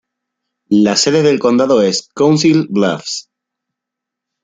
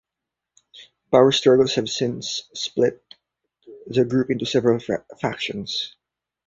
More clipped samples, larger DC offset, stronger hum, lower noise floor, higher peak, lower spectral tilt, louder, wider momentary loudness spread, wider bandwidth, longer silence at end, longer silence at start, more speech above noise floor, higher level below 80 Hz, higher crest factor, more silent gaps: neither; neither; neither; second, -81 dBFS vs -85 dBFS; about the same, 0 dBFS vs -2 dBFS; about the same, -4.5 dB/octave vs -5 dB/octave; first, -13 LUFS vs -21 LUFS; second, 7 LU vs 12 LU; first, 9.4 kHz vs 7.8 kHz; first, 1.25 s vs 0.6 s; about the same, 0.7 s vs 0.75 s; first, 69 dB vs 65 dB; about the same, -58 dBFS vs -60 dBFS; second, 14 dB vs 22 dB; neither